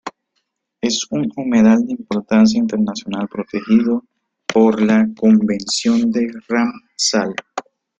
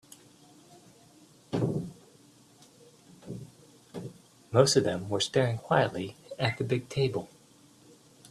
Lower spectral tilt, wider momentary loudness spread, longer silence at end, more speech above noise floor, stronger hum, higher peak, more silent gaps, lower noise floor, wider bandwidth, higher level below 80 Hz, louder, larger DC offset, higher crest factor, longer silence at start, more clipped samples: about the same, -4.5 dB/octave vs -5 dB/octave; second, 11 LU vs 21 LU; second, 0.4 s vs 1.05 s; first, 56 dB vs 31 dB; neither; first, -2 dBFS vs -6 dBFS; neither; first, -71 dBFS vs -58 dBFS; second, 9 kHz vs 14 kHz; first, -56 dBFS vs -64 dBFS; first, -17 LUFS vs -29 LUFS; neither; second, 14 dB vs 26 dB; second, 0.05 s vs 1.5 s; neither